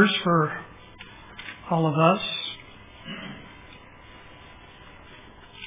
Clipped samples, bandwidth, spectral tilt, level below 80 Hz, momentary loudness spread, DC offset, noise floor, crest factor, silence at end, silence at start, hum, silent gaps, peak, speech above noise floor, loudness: under 0.1%; 3.9 kHz; -10 dB/octave; -56 dBFS; 26 LU; under 0.1%; -47 dBFS; 24 dB; 0 s; 0 s; none; none; -4 dBFS; 25 dB; -24 LUFS